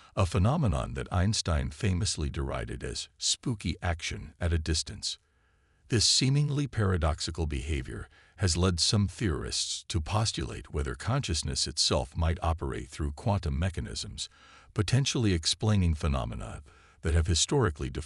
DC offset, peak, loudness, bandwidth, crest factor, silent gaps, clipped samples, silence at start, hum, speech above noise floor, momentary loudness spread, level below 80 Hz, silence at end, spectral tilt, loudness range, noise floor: under 0.1%; -12 dBFS; -29 LUFS; 12 kHz; 18 dB; none; under 0.1%; 0.15 s; none; 38 dB; 11 LU; -40 dBFS; 0 s; -4.5 dB/octave; 3 LU; -67 dBFS